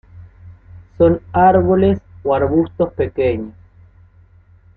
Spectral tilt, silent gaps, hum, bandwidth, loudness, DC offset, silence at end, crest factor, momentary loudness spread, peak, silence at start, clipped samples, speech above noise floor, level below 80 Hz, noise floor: -11.5 dB/octave; none; none; 4.4 kHz; -16 LUFS; under 0.1%; 1.25 s; 16 dB; 8 LU; -2 dBFS; 0.15 s; under 0.1%; 33 dB; -42 dBFS; -48 dBFS